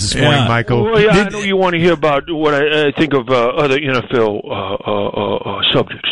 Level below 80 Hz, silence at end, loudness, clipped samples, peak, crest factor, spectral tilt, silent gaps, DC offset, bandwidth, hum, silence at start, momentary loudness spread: -38 dBFS; 0 s; -14 LUFS; under 0.1%; -2 dBFS; 12 dB; -5 dB/octave; none; 0.9%; 11.5 kHz; none; 0 s; 7 LU